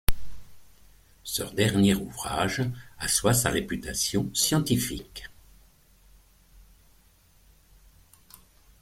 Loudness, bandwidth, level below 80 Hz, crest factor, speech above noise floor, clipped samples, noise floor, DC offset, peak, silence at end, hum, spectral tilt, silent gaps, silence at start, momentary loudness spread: -26 LUFS; 16.5 kHz; -42 dBFS; 26 dB; 33 dB; under 0.1%; -59 dBFS; under 0.1%; -2 dBFS; 3.5 s; none; -4 dB/octave; none; 0.1 s; 18 LU